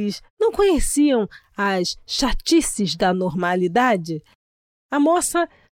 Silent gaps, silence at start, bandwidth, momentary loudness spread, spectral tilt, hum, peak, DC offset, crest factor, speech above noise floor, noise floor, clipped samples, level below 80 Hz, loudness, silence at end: 0.30-0.37 s, 4.35-4.89 s; 0 s; 16.5 kHz; 7 LU; -4 dB/octave; none; -6 dBFS; under 0.1%; 14 dB; over 70 dB; under -90 dBFS; under 0.1%; -36 dBFS; -20 LUFS; 0.35 s